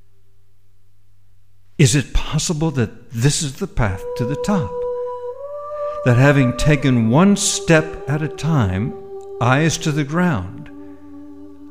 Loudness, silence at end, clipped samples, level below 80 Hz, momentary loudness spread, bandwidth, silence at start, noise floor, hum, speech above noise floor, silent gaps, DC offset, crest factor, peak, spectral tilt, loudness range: -18 LUFS; 0 s; under 0.1%; -34 dBFS; 19 LU; 15.5 kHz; 1.8 s; -56 dBFS; none; 39 dB; none; 1%; 18 dB; 0 dBFS; -5.5 dB/octave; 6 LU